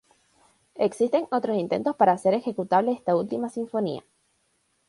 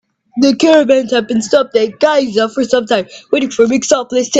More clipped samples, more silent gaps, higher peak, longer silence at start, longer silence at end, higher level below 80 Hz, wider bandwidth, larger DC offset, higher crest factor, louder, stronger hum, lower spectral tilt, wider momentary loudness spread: neither; neither; second, -6 dBFS vs 0 dBFS; first, 0.75 s vs 0.35 s; first, 0.9 s vs 0 s; second, -70 dBFS vs -56 dBFS; first, 11.5 kHz vs 9.2 kHz; neither; first, 18 dB vs 12 dB; second, -25 LUFS vs -12 LUFS; neither; first, -6.5 dB/octave vs -3.5 dB/octave; about the same, 8 LU vs 7 LU